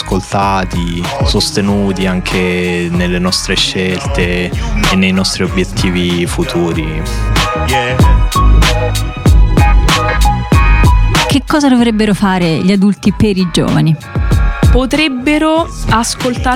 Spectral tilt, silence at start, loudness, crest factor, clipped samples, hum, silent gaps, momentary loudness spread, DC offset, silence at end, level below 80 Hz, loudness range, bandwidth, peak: -5 dB/octave; 0 s; -12 LUFS; 10 dB; under 0.1%; none; none; 5 LU; under 0.1%; 0 s; -16 dBFS; 3 LU; 16 kHz; 0 dBFS